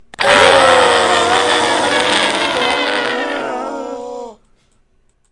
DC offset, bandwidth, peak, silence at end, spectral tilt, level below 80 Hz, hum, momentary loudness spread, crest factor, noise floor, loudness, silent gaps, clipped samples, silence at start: under 0.1%; 11.5 kHz; 0 dBFS; 1 s; -2 dB/octave; -50 dBFS; none; 17 LU; 14 dB; -56 dBFS; -12 LUFS; none; under 0.1%; 0.2 s